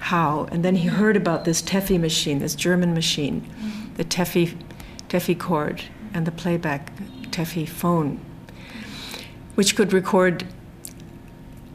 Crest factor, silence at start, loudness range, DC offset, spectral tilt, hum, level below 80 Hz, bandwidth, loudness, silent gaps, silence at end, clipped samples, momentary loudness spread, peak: 18 dB; 0 s; 6 LU; under 0.1%; -4.5 dB/octave; none; -48 dBFS; 15.5 kHz; -22 LUFS; none; 0 s; under 0.1%; 20 LU; -6 dBFS